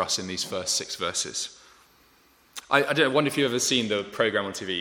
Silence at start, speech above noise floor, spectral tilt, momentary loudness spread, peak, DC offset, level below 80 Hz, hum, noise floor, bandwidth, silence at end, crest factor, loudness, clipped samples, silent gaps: 0 s; 34 dB; -2.5 dB/octave; 9 LU; -4 dBFS; under 0.1%; -68 dBFS; none; -60 dBFS; 19 kHz; 0 s; 24 dB; -25 LUFS; under 0.1%; none